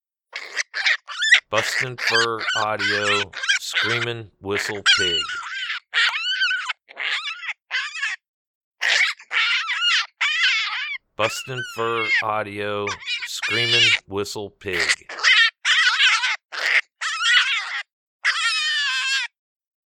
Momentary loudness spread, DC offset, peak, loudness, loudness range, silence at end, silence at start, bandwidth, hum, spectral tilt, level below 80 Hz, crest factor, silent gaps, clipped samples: 12 LU; under 0.1%; -2 dBFS; -20 LUFS; 5 LU; 0.6 s; 0.35 s; 18.5 kHz; none; -1 dB/octave; -64 dBFS; 20 dB; 8.28-8.71 s, 17.92-18.19 s; under 0.1%